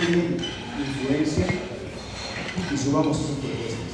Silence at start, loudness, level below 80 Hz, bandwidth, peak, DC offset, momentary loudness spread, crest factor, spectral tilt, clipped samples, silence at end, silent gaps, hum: 0 s; -26 LUFS; -44 dBFS; 11 kHz; -8 dBFS; under 0.1%; 10 LU; 18 dB; -5.5 dB/octave; under 0.1%; 0 s; none; none